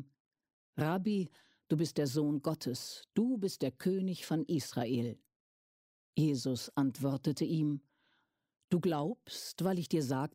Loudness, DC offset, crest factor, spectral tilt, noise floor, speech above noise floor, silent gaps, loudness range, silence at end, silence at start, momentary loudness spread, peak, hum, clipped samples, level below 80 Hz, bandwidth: -35 LUFS; under 0.1%; 16 dB; -6.5 dB/octave; -78 dBFS; 44 dB; 0.20-0.31 s, 0.53-0.73 s, 5.36-6.13 s, 8.64-8.68 s; 1 LU; 0.05 s; 0 s; 8 LU; -18 dBFS; none; under 0.1%; -76 dBFS; 16 kHz